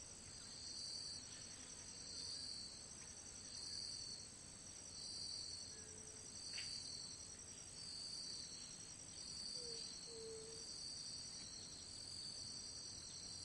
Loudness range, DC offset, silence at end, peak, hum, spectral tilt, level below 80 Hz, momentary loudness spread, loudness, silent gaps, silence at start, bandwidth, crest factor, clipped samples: 1 LU; under 0.1%; 0 s; -36 dBFS; none; -1 dB/octave; -74 dBFS; 6 LU; -50 LUFS; none; 0 s; 12 kHz; 16 dB; under 0.1%